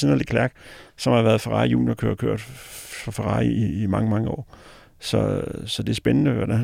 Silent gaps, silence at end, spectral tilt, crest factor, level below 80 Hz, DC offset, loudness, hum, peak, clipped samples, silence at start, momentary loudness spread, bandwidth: none; 0 s; -6.5 dB/octave; 18 dB; -44 dBFS; under 0.1%; -23 LUFS; none; -6 dBFS; under 0.1%; 0 s; 14 LU; 16 kHz